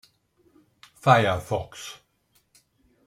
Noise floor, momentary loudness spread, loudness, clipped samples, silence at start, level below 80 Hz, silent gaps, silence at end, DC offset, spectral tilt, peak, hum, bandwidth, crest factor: -68 dBFS; 20 LU; -23 LUFS; under 0.1%; 1.05 s; -58 dBFS; none; 1.15 s; under 0.1%; -5.5 dB/octave; -2 dBFS; none; 15.5 kHz; 26 dB